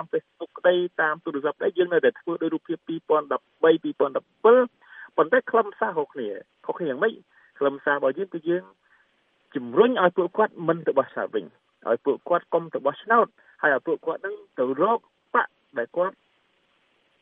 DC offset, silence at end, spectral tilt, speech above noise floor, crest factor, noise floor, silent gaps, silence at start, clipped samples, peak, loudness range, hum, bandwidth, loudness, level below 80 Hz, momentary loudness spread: under 0.1%; 1.1 s; -9 dB/octave; 43 dB; 20 dB; -67 dBFS; none; 0 s; under 0.1%; -4 dBFS; 5 LU; none; 3.8 kHz; -24 LUFS; -82 dBFS; 10 LU